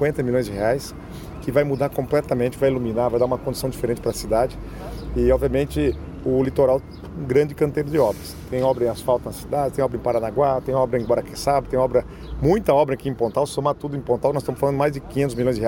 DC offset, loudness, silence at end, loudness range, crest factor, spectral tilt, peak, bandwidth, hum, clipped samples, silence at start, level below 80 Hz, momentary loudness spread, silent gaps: under 0.1%; -22 LUFS; 0 s; 2 LU; 16 dB; -7 dB/octave; -4 dBFS; 17 kHz; none; under 0.1%; 0 s; -38 dBFS; 7 LU; none